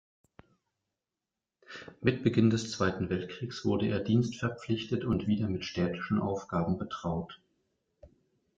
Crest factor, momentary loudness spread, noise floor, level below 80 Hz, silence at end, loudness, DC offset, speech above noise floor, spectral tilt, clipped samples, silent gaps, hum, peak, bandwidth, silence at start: 22 dB; 9 LU; -90 dBFS; -60 dBFS; 0.5 s; -31 LUFS; under 0.1%; 59 dB; -6.5 dB/octave; under 0.1%; none; none; -10 dBFS; 7.8 kHz; 1.7 s